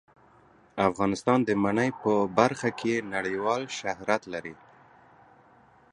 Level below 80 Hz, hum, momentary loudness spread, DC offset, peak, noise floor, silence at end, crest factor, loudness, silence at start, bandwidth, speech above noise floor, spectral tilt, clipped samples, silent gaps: -62 dBFS; none; 9 LU; under 0.1%; -6 dBFS; -58 dBFS; 1.4 s; 24 dB; -27 LUFS; 0.75 s; 11 kHz; 32 dB; -5.5 dB/octave; under 0.1%; none